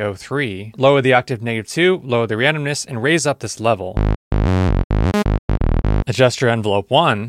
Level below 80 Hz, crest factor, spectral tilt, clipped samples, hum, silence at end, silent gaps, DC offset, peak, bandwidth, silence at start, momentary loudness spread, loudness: -24 dBFS; 16 dB; -5.5 dB/octave; under 0.1%; none; 0 s; 4.16-4.31 s, 4.84-4.90 s, 5.39-5.48 s; under 0.1%; 0 dBFS; 14 kHz; 0 s; 7 LU; -18 LUFS